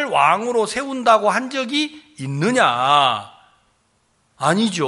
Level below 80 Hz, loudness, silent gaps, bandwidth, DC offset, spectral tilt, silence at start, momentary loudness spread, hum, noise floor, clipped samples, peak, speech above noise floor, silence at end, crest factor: -64 dBFS; -18 LUFS; none; 11.5 kHz; under 0.1%; -4 dB/octave; 0 s; 10 LU; none; -63 dBFS; under 0.1%; -2 dBFS; 45 dB; 0 s; 18 dB